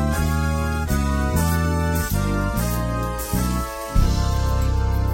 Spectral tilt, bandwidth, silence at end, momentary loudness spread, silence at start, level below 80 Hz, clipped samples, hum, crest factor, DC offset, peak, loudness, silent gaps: -6 dB/octave; 16.5 kHz; 0 s; 4 LU; 0 s; -24 dBFS; under 0.1%; none; 14 dB; under 0.1%; -6 dBFS; -22 LUFS; none